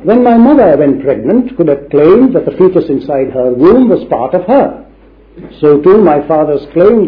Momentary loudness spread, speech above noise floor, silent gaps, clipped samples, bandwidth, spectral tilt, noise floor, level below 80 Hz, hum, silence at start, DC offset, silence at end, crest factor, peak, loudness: 7 LU; 32 dB; none; 2%; 5.2 kHz; -11 dB/octave; -39 dBFS; -38 dBFS; none; 0 s; under 0.1%; 0 s; 8 dB; 0 dBFS; -8 LUFS